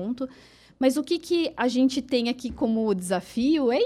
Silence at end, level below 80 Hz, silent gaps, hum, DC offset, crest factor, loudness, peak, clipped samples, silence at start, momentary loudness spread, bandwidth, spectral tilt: 0 s; -56 dBFS; none; none; under 0.1%; 16 dB; -25 LUFS; -8 dBFS; under 0.1%; 0 s; 6 LU; 13.5 kHz; -5 dB/octave